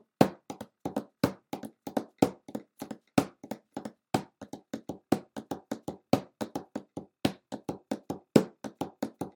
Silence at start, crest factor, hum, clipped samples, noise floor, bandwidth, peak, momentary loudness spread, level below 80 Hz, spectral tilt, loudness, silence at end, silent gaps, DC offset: 0.2 s; 30 dB; none; under 0.1%; -48 dBFS; 19 kHz; -4 dBFS; 16 LU; -66 dBFS; -6 dB/octave; -34 LUFS; 0.05 s; none; under 0.1%